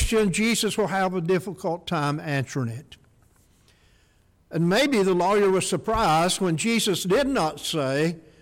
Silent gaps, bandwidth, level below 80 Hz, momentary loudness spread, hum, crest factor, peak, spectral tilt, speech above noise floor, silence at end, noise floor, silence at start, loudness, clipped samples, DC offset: none; 17 kHz; -44 dBFS; 8 LU; none; 10 dB; -14 dBFS; -4.5 dB/octave; 38 dB; 0.2 s; -61 dBFS; 0 s; -23 LUFS; under 0.1%; under 0.1%